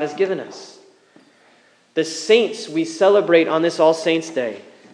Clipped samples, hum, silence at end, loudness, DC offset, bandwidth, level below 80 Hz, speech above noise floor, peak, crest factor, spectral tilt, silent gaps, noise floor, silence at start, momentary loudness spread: under 0.1%; none; 0.35 s; -18 LUFS; under 0.1%; 10.5 kHz; -86 dBFS; 37 dB; 0 dBFS; 20 dB; -4 dB/octave; none; -55 dBFS; 0 s; 13 LU